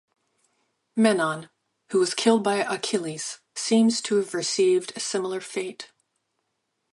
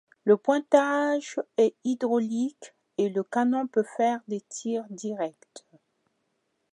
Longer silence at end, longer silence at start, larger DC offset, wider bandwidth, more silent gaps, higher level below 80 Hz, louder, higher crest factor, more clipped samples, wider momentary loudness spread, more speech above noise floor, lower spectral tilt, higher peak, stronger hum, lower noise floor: about the same, 1.05 s vs 1.15 s; first, 0.95 s vs 0.25 s; neither; about the same, 11.5 kHz vs 10.5 kHz; neither; first, -76 dBFS vs -84 dBFS; first, -24 LUFS vs -27 LUFS; about the same, 18 dB vs 20 dB; neither; about the same, 12 LU vs 11 LU; first, 54 dB vs 50 dB; second, -3.5 dB/octave vs -5 dB/octave; about the same, -6 dBFS vs -6 dBFS; neither; about the same, -77 dBFS vs -76 dBFS